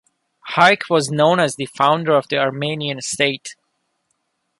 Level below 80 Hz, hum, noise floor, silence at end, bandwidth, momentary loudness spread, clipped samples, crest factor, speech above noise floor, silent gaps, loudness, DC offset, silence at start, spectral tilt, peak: -64 dBFS; none; -71 dBFS; 1.05 s; 11.5 kHz; 10 LU; under 0.1%; 18 dB; 53 dB; none; -17 LUFS; under 0.1%; 0.45 s; -4 dB/octave; -2 dBFS